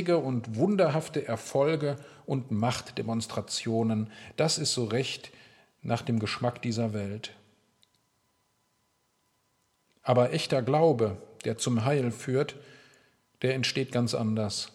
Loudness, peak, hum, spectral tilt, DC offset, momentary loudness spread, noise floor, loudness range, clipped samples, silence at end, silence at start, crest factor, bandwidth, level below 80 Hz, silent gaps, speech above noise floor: -29 LUFS; -8 dBFS; none; -5 dB/octave; under 0.1%; 10 LU; -73 dBFS; 7 LU; under 0.1%; 0.05 s; 0 s; 20 dB; 14.5 kHz; -70 dBFS; none; 45 dB